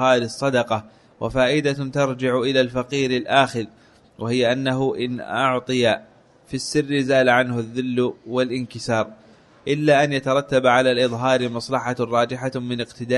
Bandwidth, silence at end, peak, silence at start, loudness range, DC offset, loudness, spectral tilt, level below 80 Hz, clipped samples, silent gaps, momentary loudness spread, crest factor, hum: 11.5 kHz; 0 s; -2 dBFS; 0 s; 2 LU; under 0.1%; -21 LUFS; -5 dB/octave; -54 dBFS; under 0.1%; none; 10 LU; 20 dB; none